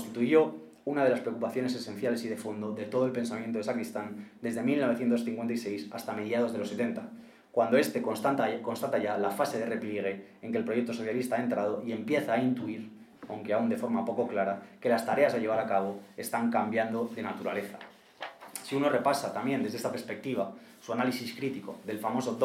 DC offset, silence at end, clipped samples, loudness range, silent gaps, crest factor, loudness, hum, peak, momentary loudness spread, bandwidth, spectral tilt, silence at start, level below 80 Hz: under 0.1%; 0 s; under 0.1%; 3 LU; none; 20 dB; -31 LUFS; none; -10 dBFS; 12 LU; 16 kHz; -5.5 dB/octave; 0 s; -82 dBFS